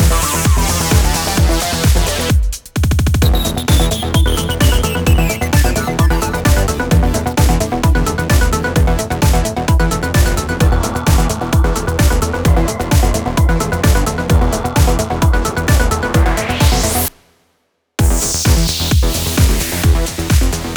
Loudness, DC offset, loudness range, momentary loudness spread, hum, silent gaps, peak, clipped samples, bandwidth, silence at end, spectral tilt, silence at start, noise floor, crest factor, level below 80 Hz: -14 LUFS; under 0.1%; 1 LU; 2 LU; none; none; 0 dBFS; under 0.1%; over 20 kHz; 0 s; -4.5 dB/octave; 0 s; -63 dBFS; 12 dB; -16 dBFS